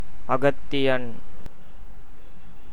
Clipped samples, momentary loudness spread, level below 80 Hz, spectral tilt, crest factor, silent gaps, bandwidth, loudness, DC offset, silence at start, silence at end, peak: under 0.1%; 24 LU; -46 dBFS; -6.5 dB/octave; 20 dB; none; 19.5 kHz; -25 LUFS; 10%; 0 s; 0 s; -6 dBFS